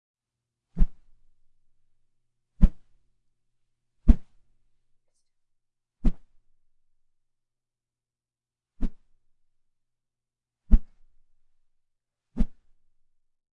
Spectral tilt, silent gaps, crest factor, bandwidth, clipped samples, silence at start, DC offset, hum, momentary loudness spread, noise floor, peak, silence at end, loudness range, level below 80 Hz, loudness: -10 dB/octave; none; 28 dB; 2.5 kHz; under 0.1%; 0.75 s; under 0.1%; none; 13 LU; under -90 dBFS; 0 dBFS; 1.05 s; 15 LU; -30 dBFS; -30 LUFS